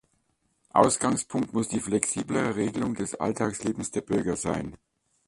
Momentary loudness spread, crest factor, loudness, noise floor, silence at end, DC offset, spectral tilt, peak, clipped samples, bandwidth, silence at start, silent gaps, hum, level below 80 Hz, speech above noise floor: 8 LU; 24 dB; -27 LUFS; -72 dBFS; 0.5 s; under 0.1%; -4.5 dB/octave; -4 dBFS; under 0.1%; 11.5 kHz; 0.75 s; none; none; -56 dBFS; 45 dB